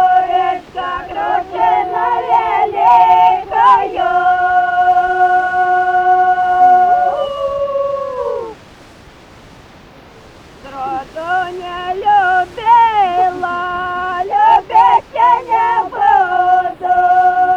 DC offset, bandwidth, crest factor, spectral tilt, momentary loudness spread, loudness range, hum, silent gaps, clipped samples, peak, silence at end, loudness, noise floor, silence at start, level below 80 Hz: under 0.1%; 7.4 kHz; 12 dB; -4.5 dB/octave; 11 LU; 12 LU; none; none; under 0.1%; -2 dBFS; 0 s; -13 LUFS; -39 dBFS; 0 s; -46 dBFS